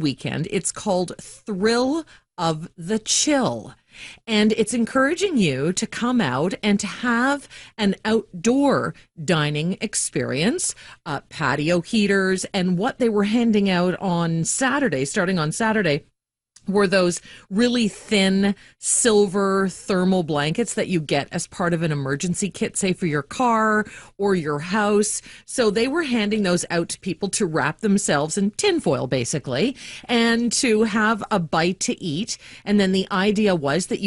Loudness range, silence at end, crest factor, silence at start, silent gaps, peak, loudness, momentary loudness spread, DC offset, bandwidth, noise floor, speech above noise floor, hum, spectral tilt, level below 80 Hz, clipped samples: 2 LU; 0 s; 16 dB; 0 s; none; -6 dBFS; -21 LUFS; 8 LU; under 0.1%; 11.5 kHz; -58 dBFS; 37 dB; none; -4.5 dB/octave; -54 dBFS; under 0.1%